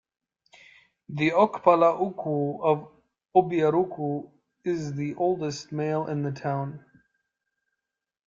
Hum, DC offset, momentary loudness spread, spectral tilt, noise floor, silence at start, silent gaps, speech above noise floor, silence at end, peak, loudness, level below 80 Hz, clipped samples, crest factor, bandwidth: none; under 0.1%; 11 LU; -7 dB/octave; -87 dBFS; 1.1 s; none; 62 dB; 1.5 s; -4 dBFS; -26 LUFS; -68 dBFS; under 0.1%; 22 dB; 7.6 kHz